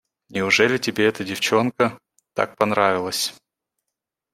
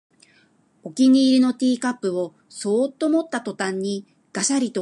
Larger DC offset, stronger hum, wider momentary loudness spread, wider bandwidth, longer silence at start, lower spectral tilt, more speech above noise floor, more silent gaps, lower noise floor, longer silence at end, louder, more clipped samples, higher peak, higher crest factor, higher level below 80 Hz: neither; neither; second, 9 LU vs 16 LU; first, 16 kHz vs 11 kHz; second, 0.3 s vs 0.85 s; about the same, -3.5 dB/octave vs -4 dB/octave; first, 63 dB vs 39 dB; neither; first, -83 dBFS vs -59 dBFS; first, 1 s vs 0 s; about the same, -21 LUFS vs -21 LUFS; neither; first, -2 dBFS vs -8 dBFS; first, 20 dB vs 14 dB; first, -64 dBFS vs -76 dBFS